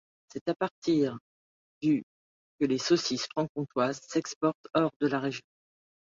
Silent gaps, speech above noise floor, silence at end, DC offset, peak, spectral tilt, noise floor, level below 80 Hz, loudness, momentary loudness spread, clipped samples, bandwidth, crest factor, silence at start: 0.41-0.46 s, 0.71-0.82 s, 1.21-1.81 s, 2.03-2.58 s, 3.49-3.55 s, 4.36-4.41 s, 4.55-4.64 s, 4.96-5.00 s; over 61 dB; 0.65 s; under 0.1%; -14 dBFS; -5 dB/octave; under -90 dBFS; -70 dBFS; -30 LUFS; 8 LU; under 0.1%; 7.6 kHz; 18 dB; 0.35 s